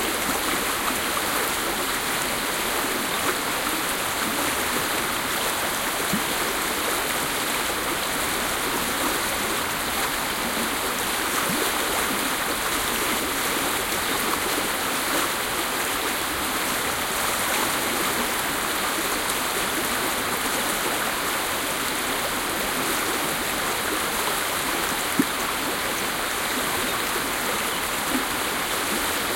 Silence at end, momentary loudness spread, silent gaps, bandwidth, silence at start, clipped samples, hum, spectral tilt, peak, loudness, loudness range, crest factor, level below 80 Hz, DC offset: 0 s; 1 LU; none; 17 kHz; 0 s; under 0.1%; none; -1.5 dB/octave; -8 dBFS; -23 LUFS; 1 LU; 18 dB; -48 dBFS; under 0.1%